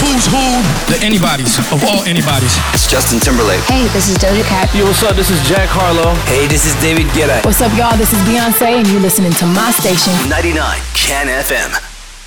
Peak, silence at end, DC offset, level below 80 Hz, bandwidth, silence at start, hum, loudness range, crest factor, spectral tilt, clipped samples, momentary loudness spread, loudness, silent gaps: -2 dBFS; 0 s; under 0.1%; -22 dBFS; over 20 kHz; 0 s; none; 1 LU; 10 dB; -4 dB/octave; under 0.1%; 3 LU; -11 LUFS; none